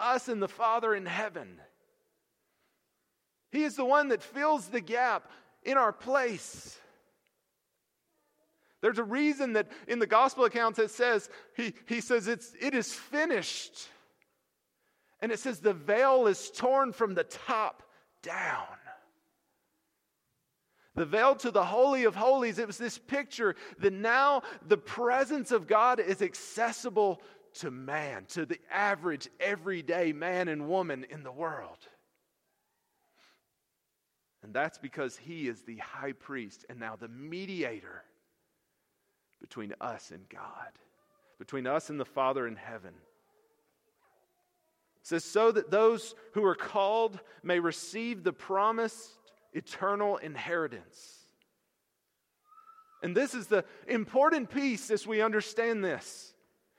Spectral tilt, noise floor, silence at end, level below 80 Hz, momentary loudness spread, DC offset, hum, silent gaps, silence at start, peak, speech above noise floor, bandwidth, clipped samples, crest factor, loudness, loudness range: -4 dB/octave; -82 dBFS; 0.5 s; -78 dBFS; 17 LU; under 0.1%; none; none; 0 s; -12 dBFS; 51 dB; 15 kHz; under 0.1%; 22 dB; -30 LUFS; 13 LU